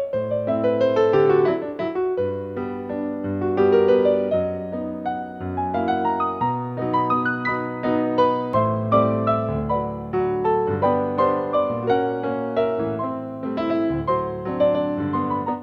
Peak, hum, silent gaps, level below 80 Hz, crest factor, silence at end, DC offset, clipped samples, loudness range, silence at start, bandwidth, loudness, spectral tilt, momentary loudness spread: -4 dBFS; none; none; -50 dBFS; 18 dB; 0 s; under 0.1%; under 0.1%; 2 LU; 0 s; 6.2 kHz; -22 LUFS; -9 dB/octave; 10 LU